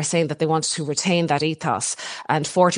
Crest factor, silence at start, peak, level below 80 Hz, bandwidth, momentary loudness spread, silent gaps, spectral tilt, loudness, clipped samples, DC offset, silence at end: 18 dB; 0 s; -4 dBFS; -64 dBFS; 11 kHz; 4 LU; none; -4 dB/octave; -22 LUFS; under 0.1%; under 0.1%; 0 s